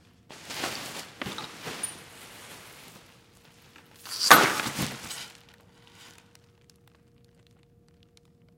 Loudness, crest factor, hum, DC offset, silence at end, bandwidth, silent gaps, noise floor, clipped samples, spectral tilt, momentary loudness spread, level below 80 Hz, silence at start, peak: -25 LUFS; 32 dB; none; under 0.1%; 2.5 s; 16.5 kHz; none; -60 dBFS; under 0.1%; -1.5 dB/octave; 29 LU; -64 dBFS; 0.3 s; 0 dBFS